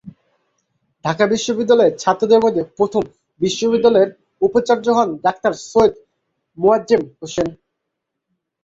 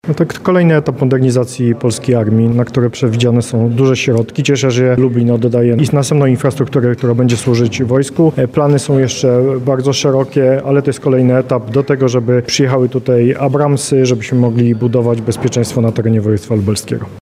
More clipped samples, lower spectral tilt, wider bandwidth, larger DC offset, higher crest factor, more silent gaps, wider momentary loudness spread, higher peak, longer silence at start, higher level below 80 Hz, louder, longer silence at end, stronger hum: neither; second, -5 dB/octave vs -6.5 dB/octave; second, 7.8 kHz vs 14 kHz; neither; about the same, 16 dB vs 12 dB; neither; first, 9 LU vs 3 LU; about the same, -2 dBFS vs 0 dBFS; about the same, 0.05 s vs 0.05 s; second, -54 dBFS vs -48 dBFS; second, -17 LUFS vs -12 LUFS; first, 1.1 s vs 0.05 s; neither